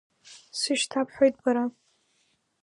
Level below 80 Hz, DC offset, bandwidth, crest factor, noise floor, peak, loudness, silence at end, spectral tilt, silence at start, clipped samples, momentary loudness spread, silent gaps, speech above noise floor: -72 dBFS; under 0.1%; 11.5 kHz; 20 dB; -71 dBFS; -8 dBFS; -26 LUFS; 0.9 s; -2 dB/octave; 0.3 s; under 0.1%; 9 LU; none; 45 dB